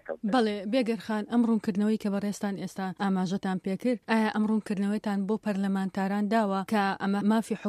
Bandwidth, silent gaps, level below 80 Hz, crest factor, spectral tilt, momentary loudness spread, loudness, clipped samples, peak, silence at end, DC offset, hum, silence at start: 13 kHz; none; -70 dBFS; 18 dB; -6.5 dB/octave; 5 LU; -28 LUFS; under 0.1%; -10 dBFS; 0 s; under 0.1%; none; 0.05 s